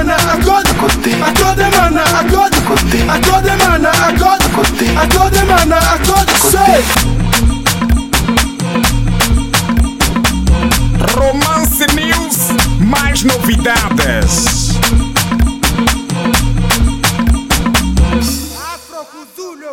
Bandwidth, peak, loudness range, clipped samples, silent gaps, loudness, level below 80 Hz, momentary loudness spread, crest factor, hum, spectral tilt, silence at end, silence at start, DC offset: 17 kHz; 0 dBFS; 3 LU; under 0.1%; none; -11 LUFS; -18 dBFS; 5 LU; 10 dB; none; -4 dB/octave; 0 s; 0 s; 1%